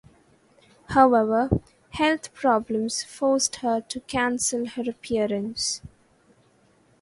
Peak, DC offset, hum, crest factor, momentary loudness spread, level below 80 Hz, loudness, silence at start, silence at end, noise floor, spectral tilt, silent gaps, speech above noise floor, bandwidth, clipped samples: -4 dBFS; under 0.1%; none; 22 dB; 10 LU; -48 dBFS; -24 LUFS; 0.9 s; 1.15 s; -61 dBFS; -3.5 dB/octave; none; 37 dB; 11.5 kHz; under 0.1%